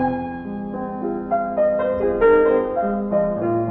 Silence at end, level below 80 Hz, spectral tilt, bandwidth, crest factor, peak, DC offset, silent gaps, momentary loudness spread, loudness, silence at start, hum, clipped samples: 0 s; -44 dBFS; -11 dB/octave; 4.2 kHz; 16 dB; -4 dBFS; under 0.1%; none; 12 LU; -20 LUFS; 0 s; none; under 0.1%